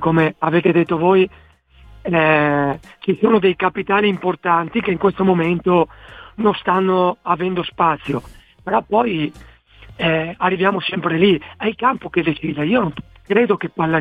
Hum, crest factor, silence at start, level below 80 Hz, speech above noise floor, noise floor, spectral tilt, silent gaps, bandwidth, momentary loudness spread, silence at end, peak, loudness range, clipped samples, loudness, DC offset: none; 16 dB; 0 s; -48 dBFS; 28 dB; -45 dBFS; -8.5 dB/octave; none; 4.9 kHz; 8 LU; 0 s; -2 dBFS; 3 LU; under 0.1%; -18 LUFS; under 0.1%